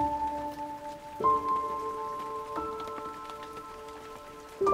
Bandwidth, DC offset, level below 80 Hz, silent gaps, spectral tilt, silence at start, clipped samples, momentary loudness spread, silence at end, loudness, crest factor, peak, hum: 16 kHz; under 0.1%; -58 dBFS; none; -5.5 dB/octave; 0 s; under 0.1%; 16 LU; 0 s; -34 LUFS; 20 dB; -12 dBFS; none